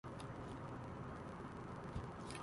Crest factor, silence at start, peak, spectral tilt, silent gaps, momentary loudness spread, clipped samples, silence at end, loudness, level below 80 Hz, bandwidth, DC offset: 18 dB; 0.05 s; -32 dBFS; -6 dB/octave; none; 2 LU; under 0.1%; 0 s; -50 LUFS; -60 dBFS; 11.5 kHz; under 0.1%